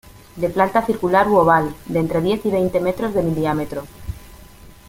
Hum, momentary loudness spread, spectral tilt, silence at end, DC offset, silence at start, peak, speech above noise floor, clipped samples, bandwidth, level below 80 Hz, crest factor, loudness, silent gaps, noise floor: none; 16 LU; -7 dB/octave; 0.2 s; under 0.1%; 0.05 s; -2 dBFS; 24 dB; under 0.1%; 17 kHz; -42 dBFS; 18 dB; -19 LUFS; none; -42 dBFS